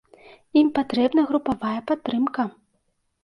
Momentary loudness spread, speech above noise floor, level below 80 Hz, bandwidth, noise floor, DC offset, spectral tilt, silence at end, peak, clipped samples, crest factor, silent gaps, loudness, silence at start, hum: 7 LU; 48 dB; -60 dBFS; 5.8 kHz; -71 dBFS; under 0.1%; -7 dB/octave; 0.75 s; -8 dBFS; under 0.1%; 16 dB; none; -23 LUFS; 0.55 s; none